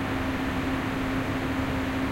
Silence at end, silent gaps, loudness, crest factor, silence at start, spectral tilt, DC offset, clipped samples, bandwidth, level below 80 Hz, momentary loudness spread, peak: 0 s; none; -28 LUFS; 12 dB; 0 s; -6 dB/octave; under 0.1%; under 0.1%; 16 kHz; -40 dBFS; 0 LU; -16 dBFS